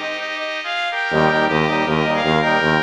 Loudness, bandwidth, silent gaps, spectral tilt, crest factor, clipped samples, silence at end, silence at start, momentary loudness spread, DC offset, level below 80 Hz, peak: -18 LUFS; 10.5 kHz; none; -5.5 dB/octave; 16 dB; under 0.1%; 0 s; 0 s; 7 LU; under 0.1%; -48 dBFS; -2 dBFS